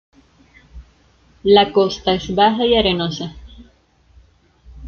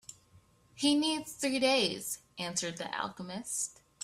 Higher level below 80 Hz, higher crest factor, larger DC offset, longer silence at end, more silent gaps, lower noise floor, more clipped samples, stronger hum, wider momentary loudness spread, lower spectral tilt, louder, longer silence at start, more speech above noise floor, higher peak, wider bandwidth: first, -42 dBFS vs -72 dBFS; about the same, 18 dB vs 20 dB; neither; about the same, 0 s vs 0 s; neither; second, -54 dBFS vs -63 dBFS; neither; neither; about the same, 11 LU vs 11 LU; first, -5.5 dB/octave vs -2.5 dB/octave; first, -16 LUFS vs -32 LUFS; first, 0.75 s vs 0.1 s; first, 39 dB vs 31 dB; first, -2 dBFS vs -14 dBFS; second, 6.8 kHz vs 15.5 kHz